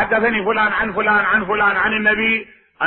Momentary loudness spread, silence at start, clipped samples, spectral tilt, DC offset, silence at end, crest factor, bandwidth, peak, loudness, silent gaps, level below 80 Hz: 3 LU; 0 s; under 0.1%; -9.5 dB/octave; under 0.1%; 0 s; 14 dB; 4.3 kHz; -4 dBFS; -16 LUFS; none; -46 dBFS